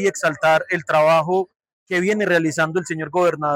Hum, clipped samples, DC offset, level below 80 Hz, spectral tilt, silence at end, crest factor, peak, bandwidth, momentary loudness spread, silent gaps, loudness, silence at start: none; under 0.1%; under 0.1%; -64 dBFS; -5 dB/octave; 0 s; 10 dB; -8 dBFS; 16 kHz; 8 LU; 1.56-1.60 s, 1.73-1.86 s; -19 LUFS; 0 s